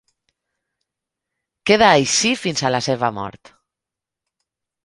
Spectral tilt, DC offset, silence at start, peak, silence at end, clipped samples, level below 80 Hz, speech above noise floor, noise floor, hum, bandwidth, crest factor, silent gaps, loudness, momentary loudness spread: -3 dB/octave; under 0.1%; 1.65 s; 0 dBFS; 1.55 s; under 0.1%; -56 dBFS; 69 dB; -86 dBFS; none; 11.5 kHz; 22 dB; none; -17 LUFS; 15 LU